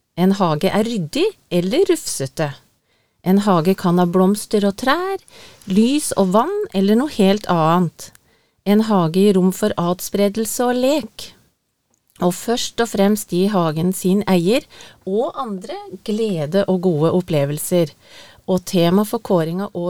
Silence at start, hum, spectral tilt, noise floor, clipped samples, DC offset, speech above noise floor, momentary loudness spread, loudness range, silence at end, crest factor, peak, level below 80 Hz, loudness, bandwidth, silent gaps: 0.15 s; none; -6 dB/octave; -67 dBFS; under 0.1%; 0.7%; 49 dB; 10 LU; 3 LU; 0 s; 16 dB; -2 dBFS; -52 dBFS; -18 LUFS; 18.5 kHz; none